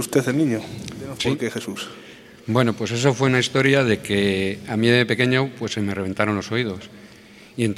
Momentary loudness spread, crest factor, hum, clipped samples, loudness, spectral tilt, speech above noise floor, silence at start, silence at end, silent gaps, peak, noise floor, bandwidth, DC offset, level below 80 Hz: 16 LU; 20 dB; none; under 0.1%; -21 LUFS; -5 dB/octave; 25 dB; 0 s; 0 s; none; -2 dBFS; -46 dBFS; 15 kHz; under 0.1%; -56 dBFS